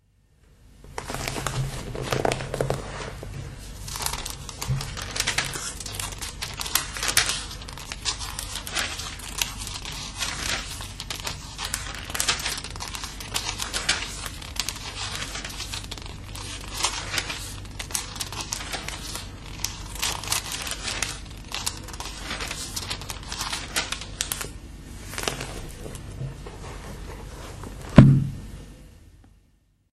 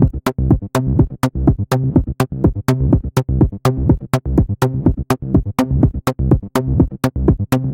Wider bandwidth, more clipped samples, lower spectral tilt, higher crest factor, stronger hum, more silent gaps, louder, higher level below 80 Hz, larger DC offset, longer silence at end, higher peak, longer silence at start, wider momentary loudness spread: second, 13.5 kHz vs 17 kHz; neither; second, -3.5 dB/octave vs -8 dB/octave; first, 28 dB vs 14 dB; neither; neither; second, -28 LUFS vs -17 LUFS; second, -40 dBFS vs -24 dBFS; neither; first, 0.65 s vs 0 s; about the same, 0 dBFS vs 0 dBFS; first, 0.6 s vs 0 s; first, 13 LU vs 2 LU